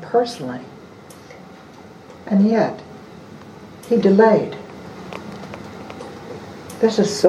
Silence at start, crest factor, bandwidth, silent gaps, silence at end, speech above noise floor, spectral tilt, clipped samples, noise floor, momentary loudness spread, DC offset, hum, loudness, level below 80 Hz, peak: 0 s; 20 dB; 13.5 kHz; none; 0 s; 25 dB; -6 dB/octave; under 0.1%; -41 dBFS; 26 LU; under 0.1%; none; -18 LUFS; -58 dBFS; 0 dBFS